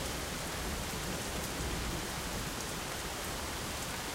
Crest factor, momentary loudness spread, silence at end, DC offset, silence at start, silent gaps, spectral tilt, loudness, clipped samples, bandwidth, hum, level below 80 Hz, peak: 20 dB; 1 LU; 0 s; under 0.1%; 0 s; none; -3 dB/octave; -37 LUFS; under 0.1%; 16 kHz; none; -46 dBFS; -18 dBFS